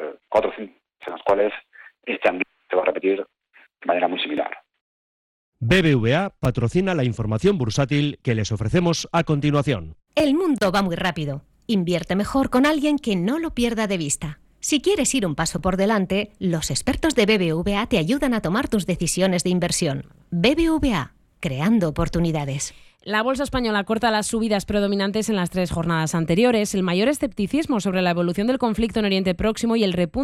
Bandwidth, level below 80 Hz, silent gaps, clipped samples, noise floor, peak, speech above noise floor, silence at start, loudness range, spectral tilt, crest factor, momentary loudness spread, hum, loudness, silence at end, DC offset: 15 kHz; -42 dBFS; 4.81-5.52 s; under 0.1%; -52 dBFS; -6 dBFS; 31 dB; 0 s; 3 LU; -5 dB/octave; 16 dB; 9 LU; none; -22 LUFS; 0 s; under 0.1%